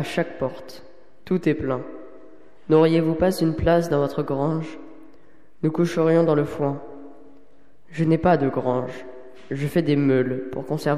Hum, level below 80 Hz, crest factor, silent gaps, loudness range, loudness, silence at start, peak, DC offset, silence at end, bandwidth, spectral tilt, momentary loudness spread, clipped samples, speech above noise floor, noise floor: none; -48 dBFS; 16 dB; none; 3 LU; -22 LUFS; 0 s; -6 dBFS; 0.9%; 0 s; 14 kHz; -7.5 dB/octave; 20 LU; under 0.1%; 36 dB; -57 dBFS